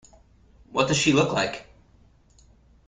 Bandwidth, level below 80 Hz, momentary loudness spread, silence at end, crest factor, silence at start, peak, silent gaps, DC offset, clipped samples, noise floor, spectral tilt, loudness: 9.6 kHz; -54 dBFS; 11 LU; 1.25 s; 22 dB; 0.7 s; -6 dBFS; none; under 0.1%; under 0.1%; -57 dBFS; -4 dB/octave; -23 LUFS